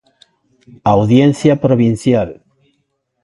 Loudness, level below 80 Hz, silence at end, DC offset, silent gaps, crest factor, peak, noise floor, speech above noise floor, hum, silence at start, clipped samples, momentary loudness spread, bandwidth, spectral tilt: -13 LUFS; -44 dBFS; 0.9 s; under 0.1%; none; 14 dB; 0 dBFS; -67 dBFS; 55 dB; none; 0.85 s; under 0.1%; 8 LU; 11.5 kHz; -7.5 dB/octave